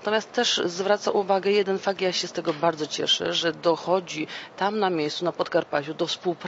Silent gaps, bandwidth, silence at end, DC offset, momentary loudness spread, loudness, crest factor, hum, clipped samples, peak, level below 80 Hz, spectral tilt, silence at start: none; 8 kHz; 0 s; under 0.1%; 6 LU; -25 LUFS; 18 dB; none; under 0.1%; -8 dBFS; -72 dBFS; -3.5 dB/octave; 0 s